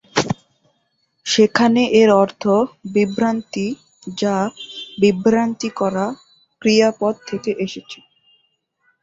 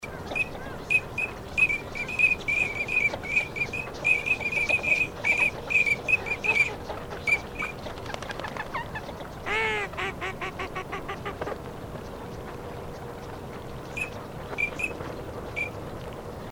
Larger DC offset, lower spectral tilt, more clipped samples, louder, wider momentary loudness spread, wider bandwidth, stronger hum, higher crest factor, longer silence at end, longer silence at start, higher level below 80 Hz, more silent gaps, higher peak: neither; about the same, -5 dB/octave vs -4 dB/octave; neither; first, -18 LUFS vs -26 LUFS; about the same, 17 LU vs 16 LU; second, 7.8 kHz vs over 20 kHz; neither; about the same, 18 dB vs 20 dB; first, 1.1 s vs 0 s; first, 0.15 s vs 0 s; second, -58 dBFS vs -48 dBFS; neither; first, 0 dBFS vs -10 dBFS